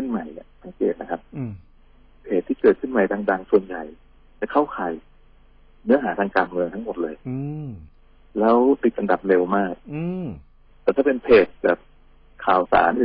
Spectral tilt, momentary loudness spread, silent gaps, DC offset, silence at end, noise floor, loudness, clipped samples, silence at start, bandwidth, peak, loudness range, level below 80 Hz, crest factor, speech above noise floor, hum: -11 dB/octave; 17 LU; none; under 0.1%; 0 s; -51 dBFS; -22 LUFS; under 0.1%; 0 s; 5.2 kHz; -4 dBFS; 4 LU; -52 dBFS; 18 dB; 30 dB; none